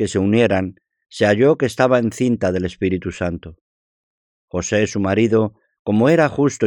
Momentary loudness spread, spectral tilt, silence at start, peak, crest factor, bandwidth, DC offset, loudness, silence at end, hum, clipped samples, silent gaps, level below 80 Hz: 11 LU; -6 dB/octave; 0 s; 0 dBFS; 18 dB; 16.5 kHz; under 0.1%; -18 LUFS; 0 s; none; under 0.1%; 3.61-4.48 s, 5.79-5.85 s; -52 dBFS